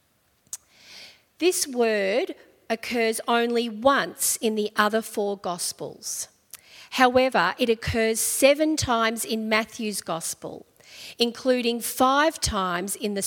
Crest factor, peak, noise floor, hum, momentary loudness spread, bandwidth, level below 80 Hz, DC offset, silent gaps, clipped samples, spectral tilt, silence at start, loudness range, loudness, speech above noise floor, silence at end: 22 dB; -2 dBFS; -65 dBFS; none; 19 LU; 18 kHz; -52 dBFS; under 0.1%; none; under 0.1%; -3 dB/octave; 0.55 s; 4 LU; -24 LUFS; 41 dB; 0 s